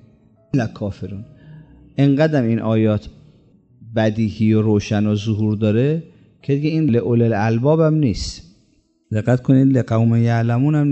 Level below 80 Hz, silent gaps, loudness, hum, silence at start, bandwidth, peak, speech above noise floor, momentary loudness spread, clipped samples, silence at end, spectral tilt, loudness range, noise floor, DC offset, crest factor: -44 dBFS; none; -18 LUFS; none; 0.55 s; 8.2 kHz; -2 dBFS; 43 dB; 11 LU; under 0.1%; 0 s; -8 dB/octave; 3 LU; -60 dBFS; under 0.1%; 16 dB